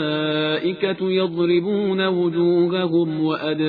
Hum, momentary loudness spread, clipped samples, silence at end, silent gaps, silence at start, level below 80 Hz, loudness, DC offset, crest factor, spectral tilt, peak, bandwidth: none; 4 LU; under 0.1%; 0 s; none; 0 s; -66 dBFS; -20 LUFS; under 0.1%; 12 dB; -9.5 dB/octave; -8 dBFS; 4.9 kHz